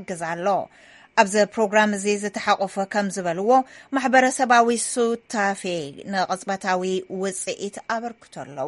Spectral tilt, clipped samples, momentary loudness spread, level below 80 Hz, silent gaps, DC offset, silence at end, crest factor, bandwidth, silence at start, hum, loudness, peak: -3.5 dB/octave; under 0.1%; 11 LU; -68 dBFS; none; under 0.1%; 0 s; 20 dB; 11.5 kHz; 0 s; none; -22 LUFS; -2 dBFS